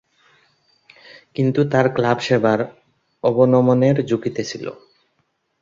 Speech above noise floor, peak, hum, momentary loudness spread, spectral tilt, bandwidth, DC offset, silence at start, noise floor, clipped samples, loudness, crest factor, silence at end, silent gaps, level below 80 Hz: 51 dB; -2 dBFS; none; 14 LU; -7 dB/octave; 7.6 kHz; under 0.1%; 1.4 s; -69 dBFS; under 0.1%; -18 LUFS; 18 dB; 0.9 s; none; -60 dBFS